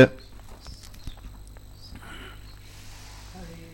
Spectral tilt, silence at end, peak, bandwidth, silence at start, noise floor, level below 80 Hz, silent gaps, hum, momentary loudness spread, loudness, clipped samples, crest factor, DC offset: -6.5 dB/octave; 0 s; -4 dBFS; 17 kHz; 0 s; -44 dBFS; -44 dBFS; none; 50 Hz at -45 dBFS; 5 LU; -32 LUFS; under 0.1%; 26 dB; under 0.1%